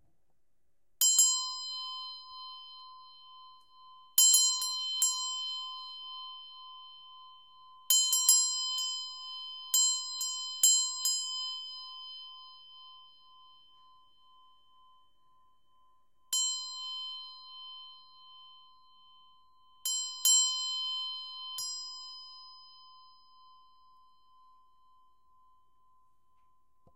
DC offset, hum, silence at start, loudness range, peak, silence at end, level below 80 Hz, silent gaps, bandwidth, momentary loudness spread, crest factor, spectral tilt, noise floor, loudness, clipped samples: under 0.1%; none; 1 s; 14 LU; -8 dBFS; 4 s; -84 dBFS; none; 16 kHz; 25 LU; 26 dB; 6 dB/octave; -81 dBFS; -28 LUFS; under 0.1%